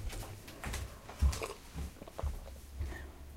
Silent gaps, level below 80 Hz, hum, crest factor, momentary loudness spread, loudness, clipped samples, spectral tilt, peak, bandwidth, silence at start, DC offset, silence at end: none; -40 dBFS; none; 20 dB; 13 LU; -42 LUFS; under 0.1%; -5 dB/octave; -20 dBFS; 16 kHz; 0 s; under 0.1%; 0 s